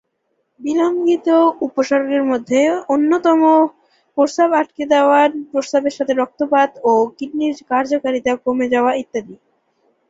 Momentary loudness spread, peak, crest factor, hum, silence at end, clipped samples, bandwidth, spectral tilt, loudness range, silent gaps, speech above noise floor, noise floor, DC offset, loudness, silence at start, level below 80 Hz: 8 LU; -2 dBFS; 16 dB; none; 0.75 s; under 0.1%; 7.8 kHz; -4.5 dB/octave; 3 LU; none; 53 dB; -69 dBFS; under 0.1%; -16 LUFS; 0.6 s; -62 dBFS